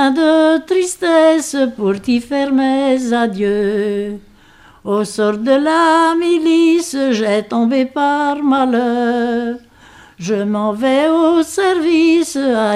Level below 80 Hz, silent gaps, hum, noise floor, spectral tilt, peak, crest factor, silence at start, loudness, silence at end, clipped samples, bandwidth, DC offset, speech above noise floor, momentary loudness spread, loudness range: -54 dBFS; none; none; -45 dBFS; -4.5 dB/octave; 0 dBFS; 14 dB; 0 s; -14 LUFS; 0 s; under 0.1%; 14 kHz; under 0.1%; 31 dB; 7 LU; 3 LU